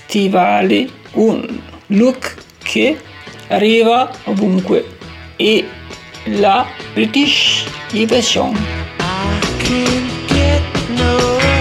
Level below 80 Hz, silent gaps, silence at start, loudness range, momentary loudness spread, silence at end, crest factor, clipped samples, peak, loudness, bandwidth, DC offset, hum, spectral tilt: -34 dBFS; none; 0.1 s; 2 LU; 15 LU; 0 s; 12 dB; under 0.1%; -2 dBFS; -14 LUFS; 14.5 kHz; under 0.1%; none; -4.5 dB/octave